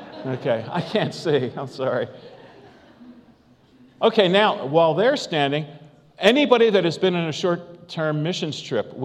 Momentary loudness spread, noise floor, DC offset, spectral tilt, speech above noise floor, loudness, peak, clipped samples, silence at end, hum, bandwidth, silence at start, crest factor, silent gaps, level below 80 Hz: 11 LU; -54 dBFS; under 0.1%; -5.5 dB/octave; 33 dB; -21 LUFS; 0 dBFS; under 0.1%; 0 s; none; 11.5 kHz; 0 s; 22 dB; none; -68 dBFS